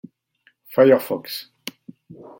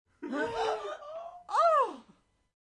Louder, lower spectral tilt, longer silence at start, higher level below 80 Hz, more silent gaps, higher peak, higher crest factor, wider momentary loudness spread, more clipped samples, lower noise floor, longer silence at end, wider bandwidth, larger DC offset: first, -19 LUFS vs -30 LUFS; first, -5.5 dB/octave vs -3.5 dB/octave; first, 0.7 s vs 0.2 s; about the same, -72 dBFS vs -68 dBFS; neither; first, -2 dBFS vs -16 dBFS; about the same, 20 dB vs 16 dB; first, 21 LU vs 18 LU; neither; about the same, -62 dBFS vs -65 dBFS; first, 1 s vs 0.65 s; first, 17 kHz vs 11 kHz; neither